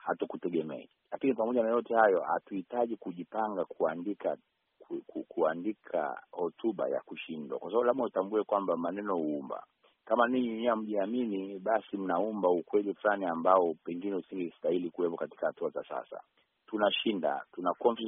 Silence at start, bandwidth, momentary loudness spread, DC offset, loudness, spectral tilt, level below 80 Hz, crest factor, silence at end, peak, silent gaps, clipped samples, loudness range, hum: 0.05 s; 3.8 kHz; 12 LU; under 0.1%; -32 LUFS; -3.5 dB/octave; -80 dBFS; 22 dB; 0 s; -10 dBFS; none; under 0.1%; 5 LU; none